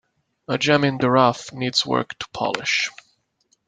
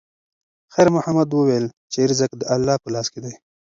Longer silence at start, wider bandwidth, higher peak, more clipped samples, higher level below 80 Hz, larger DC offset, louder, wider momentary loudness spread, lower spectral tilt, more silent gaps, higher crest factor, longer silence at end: second, 0.5 s vs 0.75 s; first, 9.4 kHz vs 7.8 kHz; about the same, -2 dBFS vs -2 dBFS; neither; about the same, -62 dBFS vs -58 dBFS; neither; about the same, -21 LUFS vs -20 LUFS; about the same, 10 LU vs 11 LU; about the same, -4.5 dB/octave vs -5.5 dB/octave; second, none vs 1.73-1.88 s; about the same, 20 dB vs 18 dB; first, 0.8 s vs 0.4 s